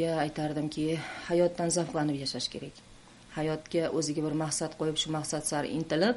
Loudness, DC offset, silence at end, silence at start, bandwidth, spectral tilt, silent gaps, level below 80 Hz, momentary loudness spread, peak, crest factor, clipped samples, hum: -31 LUFS; under 0.1%; 0 s; 0 s; 11.5 kHz; -4.5 dB/octave; none; -60 dBFS; 7 LU; -14 dBFS; 18 dB; under 0.1%; none